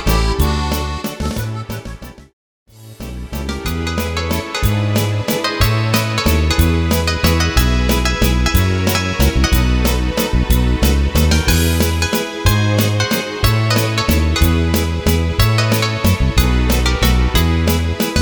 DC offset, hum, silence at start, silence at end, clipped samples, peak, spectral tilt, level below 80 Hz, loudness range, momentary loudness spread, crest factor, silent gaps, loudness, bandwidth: under 0.1%; none; 0 s; 0 s; under 0.1%; 0 dBFS; -5 dB/octave; -20 dBFS; 7 LU; 8 LU; 14 dB; 2.33-2.66 s; -16 LUFS; over 20 kHz